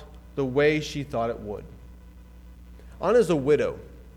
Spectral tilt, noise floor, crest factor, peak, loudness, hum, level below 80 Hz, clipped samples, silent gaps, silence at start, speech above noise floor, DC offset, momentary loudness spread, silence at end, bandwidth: -6 dB/octave; -47 dBFS; 18 dB; -10 dBFS; -25 LUFS; none; -46 dBFS; under 0.1%; none; 0 s; 23 dB; under 0.1%; 16 LU; 0 s; 13.5 kHz